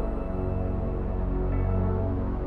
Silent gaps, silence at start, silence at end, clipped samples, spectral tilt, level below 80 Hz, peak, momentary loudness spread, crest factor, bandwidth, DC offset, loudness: none; 0 s; 0 s; under 0.1%; -11.5 dB/octave; -30 dBFS; -16 dBFS; 4 LU; 12 dB; 3.3 kHz; under 0.1%; -29 LUFS